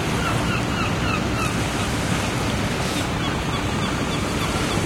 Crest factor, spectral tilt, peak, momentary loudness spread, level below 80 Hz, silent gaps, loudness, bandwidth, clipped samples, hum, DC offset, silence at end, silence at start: 14 dB; -4.5 dB/octave; -8 dBFS; 2 LU; -34 dBFS; none; -23 LUFS; 16.5 kHz; under 0.1%; none; under 0.1%; 0 s; 0 s